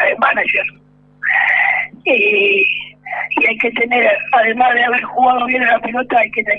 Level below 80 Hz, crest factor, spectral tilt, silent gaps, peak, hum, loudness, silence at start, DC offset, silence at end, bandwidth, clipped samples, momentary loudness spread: -56 dBFS; 14 dB; -5 dB/octave; none; -2 dBFS; 50 Hz at -50 dBFS; -13 LUFS; 0 s; under 0.1%; 0 s; 5.6 kHz; under 0.1%; 6 LU